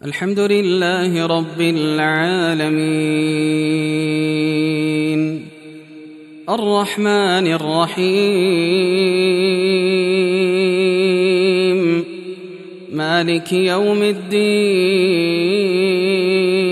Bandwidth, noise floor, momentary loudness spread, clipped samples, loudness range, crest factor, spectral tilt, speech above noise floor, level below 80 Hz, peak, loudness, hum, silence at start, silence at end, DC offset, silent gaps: 13.5 kHz; -37 dBFS; 5 LU; under 0.1%; 3 LU; 14 dB; -5.5 dB/octave; 21 dB; -68 dBFS; -2 dBFS; -16 LUFS; none; 0.05 s; 0 s; under 0.1%; none